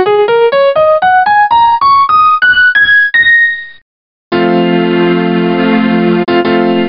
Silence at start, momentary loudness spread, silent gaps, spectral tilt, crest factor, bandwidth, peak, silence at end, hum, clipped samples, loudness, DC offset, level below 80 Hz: 0 s; 5 LU; 3.82-4.31 s; -10.5 dB/octave; 8 dB; 5.4 kHz; 0 dBFS; 0 s; none; under 0.1%; -8 LUFS; 0.6%; -48 dBFS